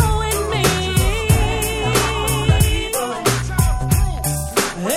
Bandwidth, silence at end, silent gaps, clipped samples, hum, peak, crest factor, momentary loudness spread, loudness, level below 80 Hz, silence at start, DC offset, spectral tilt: 18 kHz; 0 s; none; under 0.1%; none; 0 dBFS; 16 dB; 3 LU; -18 LUFS; -24 dBFS; 0 s; under 0.1%; -4 dB/octave